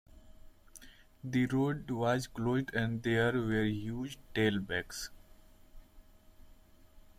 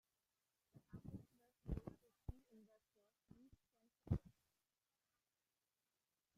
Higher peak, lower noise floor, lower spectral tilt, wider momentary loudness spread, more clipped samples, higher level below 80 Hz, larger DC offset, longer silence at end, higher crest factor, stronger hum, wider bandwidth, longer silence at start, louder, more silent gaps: first, -18 dBFS vs -28 dBFS; second, -59 dBFS vs under -90 dBFS; second, -6 dB/octave vs -9.5 dB/octave; about the same, 14 LU vs 14 LU; neither; first, -56 dBFS vs -64 dBFS; neither; second, 0.2 s vs 2.05 s; second, 18 dB vs 28 dB; neither; about the same, 16 kHz vs 15 kHz; second, 0.15 s vs 0.75 s; first, -34 LUFS vs -53 LUFS; neither